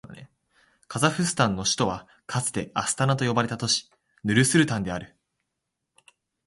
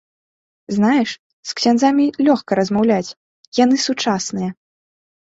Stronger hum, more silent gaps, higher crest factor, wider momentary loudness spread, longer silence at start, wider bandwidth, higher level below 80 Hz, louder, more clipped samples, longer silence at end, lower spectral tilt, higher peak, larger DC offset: neither; second, none vs 1.19-1.43 s, 3.17-3.52 s; first, 22 dB vs 16 dB; about the same, 12 LU vs 11 LU; second, 0.1 s vs 0.7 s; first, 11.5 kHz vs 8 kHz; about the same, -56 dBFS vs -58 dBFS; second, -25 LUFS vs -17 LUFS; neither; first, 1.4 s vs 0.75 s; about the same, -4 dB/octave vs -4.5 dB/octave; second, -6 dBFS vs -2 dBFS; neither